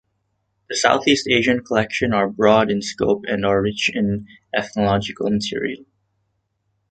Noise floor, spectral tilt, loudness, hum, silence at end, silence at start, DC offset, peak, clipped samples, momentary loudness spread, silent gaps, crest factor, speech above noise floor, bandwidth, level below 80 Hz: -71 dBFS; -4.5 dB/octave; -19 LUFS; none; 1.1 s; 0.7 s; under 0.1%; -2 dBFS; under 0.1%; 10 LU; none; 20 dB; 52 dB; 9.2 kHz; -50 dBFS